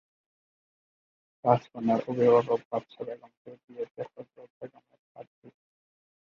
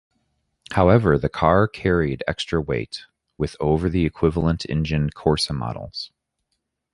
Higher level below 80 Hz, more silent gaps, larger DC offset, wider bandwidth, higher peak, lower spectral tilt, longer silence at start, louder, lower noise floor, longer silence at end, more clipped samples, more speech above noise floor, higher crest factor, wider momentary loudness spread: second, -74 dBFS vs -36 dBFS; first, 2.65-2.71 s, 3.37-3.45 s, 3.64-3.68 s, 3.91-3.95 s, 4.50-4.61 s, 4.99-5.15 s, 5.27-5.42 s vs none; neither; second, 6.8 kHz vs 11.5 kHz; second, -6 dBFS vs -2 dBFS; first, -8.5 dB/octave vs -6.5 dB/octave; first, 1.45 s vs 0.7 s; second, -27 LUFS vs -21 LUFS; first, under -90 dBFS vs -76 dBFS; about the same, 0.9 s vs 0.85 s; neither; first, over 60 dB vs 56 dB; first, 26 dB vs 20 dB; first, 24 LU vs 13 LU